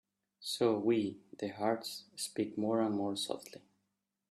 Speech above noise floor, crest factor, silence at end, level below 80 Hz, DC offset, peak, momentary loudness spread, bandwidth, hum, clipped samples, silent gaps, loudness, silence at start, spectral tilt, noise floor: 49 dB; 18 dB; 0.75 s; -80 dBFS; under 0.1%; -18 dBFS; 12 LU; 14.5 kHz; none; under 0.1%; none; -36 LUFS; 0.4 s; -4.5 dB/octave; -85 dBFS